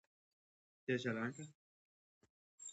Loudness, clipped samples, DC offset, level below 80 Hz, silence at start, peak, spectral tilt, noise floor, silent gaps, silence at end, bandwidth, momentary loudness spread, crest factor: -42 LUFS; under 0.1%; under 0.1%; -88 dBFS; 0.9 s; -26 dBFS; -5 dB/octave; under -90 dBFS; 1.55-2.21 s, 2.30-2.58 s; 0 s; 8.2 kHz; 15 LU; 22 dB